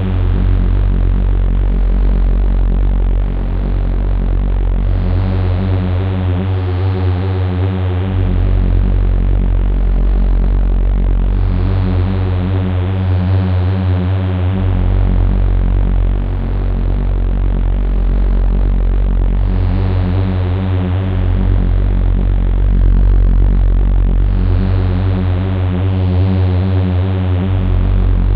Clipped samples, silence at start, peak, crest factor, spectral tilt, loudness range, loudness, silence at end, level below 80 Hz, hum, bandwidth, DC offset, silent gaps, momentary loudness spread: under 0.1%; 0 s; 0 dBFS; 12 dB; -11 dB/octave; 2 LU; -16 LUFS; 0 s; -14 dBFS; none; 4.4 kHz; under 0.1%; none; 3 LU